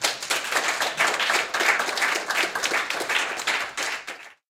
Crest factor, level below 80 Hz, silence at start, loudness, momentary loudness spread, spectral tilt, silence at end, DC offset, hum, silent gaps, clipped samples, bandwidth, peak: 20 dB; -70 dBFS; 0 s; -23 LUFS; 6 LU; 0.5 dB/octave; 0.15 s; under 0.1%; none; none; under 0.1%; 17 kHz; -6 dBFS